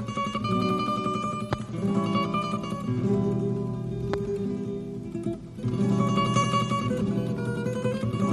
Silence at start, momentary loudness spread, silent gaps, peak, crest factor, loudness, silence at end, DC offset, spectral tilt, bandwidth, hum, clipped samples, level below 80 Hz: 0 s; 8 LU; none; -10 dBFS; 16 dB; -28 LUFS; 0 s; under 0.1%; -6.5 dB/octave; 12 kHz; none; under 0.1%; -50 dBFS